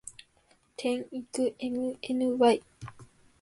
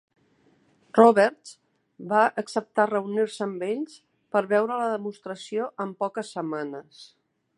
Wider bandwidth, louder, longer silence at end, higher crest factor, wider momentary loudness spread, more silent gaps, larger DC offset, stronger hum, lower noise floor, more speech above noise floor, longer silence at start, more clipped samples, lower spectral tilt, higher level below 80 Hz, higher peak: about the same, 11.5 kHz vs 11 kHz; second, -29 LUFS vs -25 LUFS; second, 0.4 s vs 0.55 s; about the same, 20 dB vs 24 dB; first, 23 LU vs 17 LU; neither; neither; neither; about the same, -66 dBFS vs -63 dBFS; about the same, 37 dB vs 39 dB; second, 0.05 s vs 0.95 s; neither; about the same, -4.5 dB/octave vs -5.5 dB/octave; first, -68 dBFS vs -82 dBFS; second, -12 dBFS vs -2 dBFS